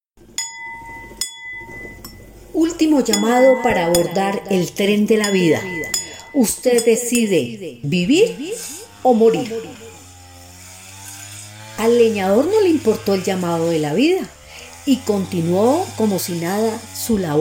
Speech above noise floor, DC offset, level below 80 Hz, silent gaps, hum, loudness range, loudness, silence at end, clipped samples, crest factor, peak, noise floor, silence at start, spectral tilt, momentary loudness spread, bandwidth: 24 dB; under 0.1%; -50 dBFS; none; none; 4 LU; -18 LUFS; 0 s; under 0.1%; 16 dB; -2 dBFS; -41 dBFS; 0.4 s; -4.5 dB/octave; 19 LU; 16.5 kHz